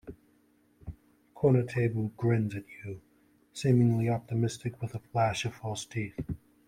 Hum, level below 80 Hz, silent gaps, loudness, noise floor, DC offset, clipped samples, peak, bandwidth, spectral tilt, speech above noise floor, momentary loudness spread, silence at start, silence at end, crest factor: none; -58 dBFS; none; -30 LUFS; -66 dBFS; under 0.1%; under 0.1%; -12 dBFS; 11 kHz; -7 dB/octave; 37 dB; 21 LU; 0.05 s; 0.3 s; 18 dB